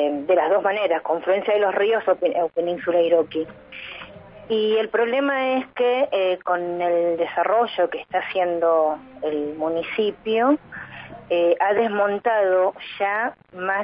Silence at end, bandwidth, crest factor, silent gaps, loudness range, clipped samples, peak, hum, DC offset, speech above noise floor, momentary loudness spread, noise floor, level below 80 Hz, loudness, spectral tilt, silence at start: 0 s; 5.2 kHz; 16 dB; none; 2 LU; under 0.1%; -6 dBFS; none; under 0.1%; 20 dB; 10 LU; -41 dBFS; -64 dBFS; -21 LUFS; -9 dB/octave; 0 s